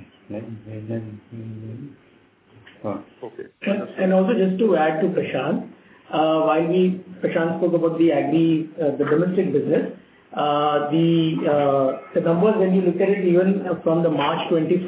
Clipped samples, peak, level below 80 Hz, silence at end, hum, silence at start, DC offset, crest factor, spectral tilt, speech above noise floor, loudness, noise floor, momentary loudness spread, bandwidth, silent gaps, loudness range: under 0.1%; -8 dBFS; -66 dBFS; 0 s; none; 0 s; under 0.1%; 14 dB; -11.5 dB/octave; 33 dB; -20 LUFS; -53 dBFS; 17 LU; 4 kHz; none; 8 LU